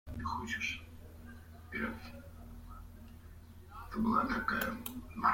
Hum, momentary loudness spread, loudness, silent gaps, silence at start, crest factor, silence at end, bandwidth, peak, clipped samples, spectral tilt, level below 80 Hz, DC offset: none; 21 LU; -37 LUFS; none; 0.05 s; 20 dB; 0 s; 16.5 kHz; -18 dBFS; under 0.1%; -5 dB/octave; -54 dBFS; under 0.1%